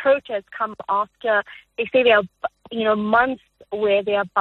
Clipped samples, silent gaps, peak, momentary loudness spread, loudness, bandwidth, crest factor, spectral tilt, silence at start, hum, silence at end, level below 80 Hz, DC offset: under 0.1%; none; -4 dBFS; 13 LU; -21 LUFS; 4.3 kHz; 16 dB; -7 dB/octave; 0 s; none; 0 s; -60 dBFS; under 0.1%